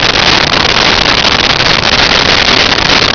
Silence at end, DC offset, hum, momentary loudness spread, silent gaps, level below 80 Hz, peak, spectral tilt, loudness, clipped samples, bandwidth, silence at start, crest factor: 0 s; under 0.1%; none; 1 LU; none; -26 dBFS; 0 dBFS; -2.5 dB/octave; -5 LUFS; under 0.1%; 5.4 kHz; 0 s; 8 dB